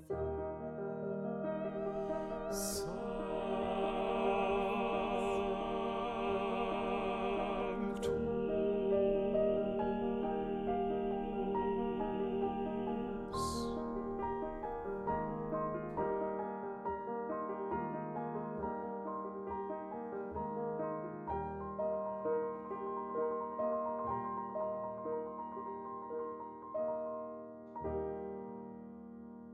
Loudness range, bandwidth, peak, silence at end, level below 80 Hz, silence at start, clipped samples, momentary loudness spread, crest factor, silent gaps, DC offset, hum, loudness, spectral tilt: 6 LU; 13.5 kHz; -22 dBFS; 0 s; -56 dBFS; 0 s; under 0.1%; 8 LU; 16 dB; none; under 0.1%; none; -38 LUFS; -6 dB/octave